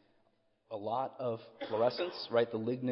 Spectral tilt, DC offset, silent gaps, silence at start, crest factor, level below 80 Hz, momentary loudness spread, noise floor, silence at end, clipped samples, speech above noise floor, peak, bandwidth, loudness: -9 dB/octave; under 0.1%; none; 0.7 s; 18 dB; -84 dBFS; 10 LU; -73 dBFS; 0 s; under 0.1%; 39 dB; -18 dBFS; 5.8 kHz; -35 LUFS